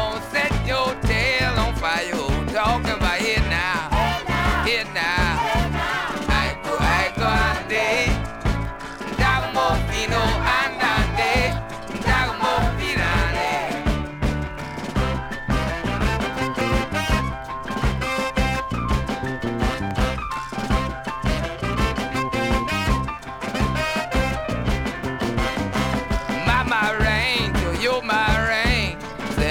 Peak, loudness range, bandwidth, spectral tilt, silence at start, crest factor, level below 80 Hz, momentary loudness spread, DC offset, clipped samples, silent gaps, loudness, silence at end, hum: -4 dBFS; 4 LU; 17.5 kHz; -5 dB/octave; 0 s; 18 dB; -30 dBFS; 7 LU; under 0.1%; under 0.1%; none; -22 LUFS; 0 s; none